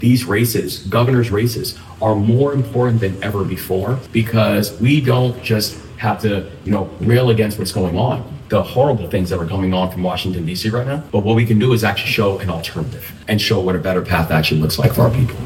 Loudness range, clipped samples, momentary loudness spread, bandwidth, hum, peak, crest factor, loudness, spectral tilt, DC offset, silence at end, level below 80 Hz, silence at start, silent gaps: 1 LU; under 0.1%; 7 LU; 17 kHz; none; 0 dBFS; 16 dB; -17 LUFS; -6 dB/octave; under 0.1%; 0 s; -40 dBFS; 0 s; none